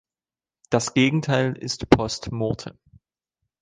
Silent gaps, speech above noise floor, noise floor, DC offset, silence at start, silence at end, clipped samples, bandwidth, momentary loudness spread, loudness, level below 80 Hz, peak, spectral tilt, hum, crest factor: none; over 68 dB; under -90 dBFS; under 0.1%; 0.7 s; 0.9 s; under 0.1%; 10 kHz; 9 LU; -23 LUFS; -46 dBFS; 0 dBFS; -5 dB/octave; none; 24 dB